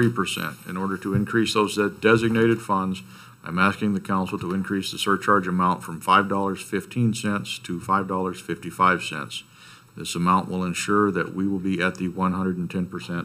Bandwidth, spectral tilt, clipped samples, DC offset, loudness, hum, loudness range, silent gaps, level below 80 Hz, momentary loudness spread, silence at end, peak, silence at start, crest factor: 15.5 kHz; -5.5 dB/octave; under 0.1%; under 0.1%; -24 LUFS; none; 3 LU; none; -58 dBFS; 10 LU; 0 s; -4 dBFS; 0 s; 20 dB